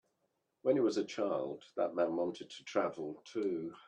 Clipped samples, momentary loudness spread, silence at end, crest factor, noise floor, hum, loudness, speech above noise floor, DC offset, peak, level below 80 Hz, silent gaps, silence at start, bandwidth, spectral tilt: under 0.1%; 10 LU; 0.1 s; 18 dB; -82 dBFS; none; -36 LUFS; 46 dB; under 0.1%; -18 dBFS; -82 dBFS; none; 0.65 s; 9.4 kHz; -5.5 dB/octave